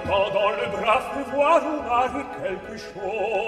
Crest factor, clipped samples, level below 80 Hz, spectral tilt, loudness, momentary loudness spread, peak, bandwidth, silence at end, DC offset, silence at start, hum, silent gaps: 18 dB; under 0.1%; -52 dBFS; -5 dB/octave; -23 LUFS; 11 LU; -6 dBFS; 13 kHz; 0 s; under 0.1%; 0 s; none; none